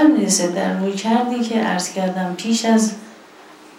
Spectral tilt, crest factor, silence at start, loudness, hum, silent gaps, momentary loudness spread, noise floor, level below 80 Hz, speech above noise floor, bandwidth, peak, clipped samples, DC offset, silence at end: -4 dB/octave; 16 dB; 0 s; -19 LUFS; none; none; 6 LU; -43 dBFS; -70 dBFS; 24 dB; 14.5 kHz; -4 dBFS; under 0.1%; under 0.1%; 0.35 s